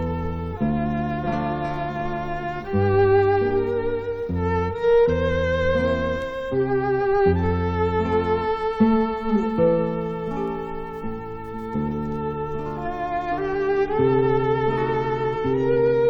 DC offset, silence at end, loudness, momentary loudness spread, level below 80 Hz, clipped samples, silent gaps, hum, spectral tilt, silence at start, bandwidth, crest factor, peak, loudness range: under 0.1%; 0 s; -23 LUFS; 9 LU; -38 dBFS; under 0.1%; none; none; -8.5 dB/octave; 0 s; 6.8 kHz; 16 dB; -6 dBFS; 5 LU